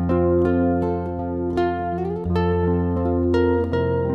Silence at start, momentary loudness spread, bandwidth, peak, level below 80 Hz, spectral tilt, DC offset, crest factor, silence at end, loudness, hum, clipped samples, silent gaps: 0 s; 7 LU; 5.6 kHz; -8 dBFS; -38 dBFS; -10 dB/octave; under 0.1%; 12 dB; 0 s; -21 LUFS; none; under 0.1%; none